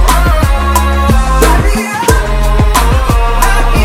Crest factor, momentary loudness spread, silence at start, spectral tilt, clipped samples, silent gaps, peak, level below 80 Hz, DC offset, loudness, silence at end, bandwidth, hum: 8 dB; 3 LU; 0 s; -5 dB/octave; 0.9%; none; 0 dBFS; -10 dBFS; under 0.1%; -10 LUFS; 0 s; 16.5 kHz; none